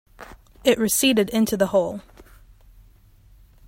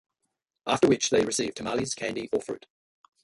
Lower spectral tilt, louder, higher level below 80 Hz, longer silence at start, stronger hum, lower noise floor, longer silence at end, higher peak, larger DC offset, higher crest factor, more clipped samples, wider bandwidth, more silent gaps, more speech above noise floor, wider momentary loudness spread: about the same, -3.5 dB/octave vs -3.5 dB/octave; first, -20 LUFS vs -27 LUFS; first, -50 dBFS vs -62 dBFS; second, 0.2 s vs 0.65 s; neither; second, -52 dBFS vs -81 dBFS; first, 1.45 s vs 0.65 s; first, -4 dBFS vs -10 dBFS; neither; about the same, 20 dB vs 20 dB; neither; first, 16.5 kHz vs 11.5 kHz; neither; second, 32 dB vs 55 dB; second, 8 LU vs 15 LU